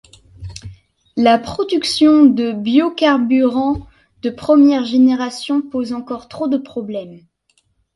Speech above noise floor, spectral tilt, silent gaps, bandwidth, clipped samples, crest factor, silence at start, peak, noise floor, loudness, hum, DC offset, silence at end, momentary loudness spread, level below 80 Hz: 47 dB; -5 dB/octave; none; 11.5 kHz; under 0.1%; 16 dB; 0.4 s; 0 dBFS; -62 dBFS; -15 LUFS; none; under 0.1%; 0.75 s; 17 LU; -48 dBFS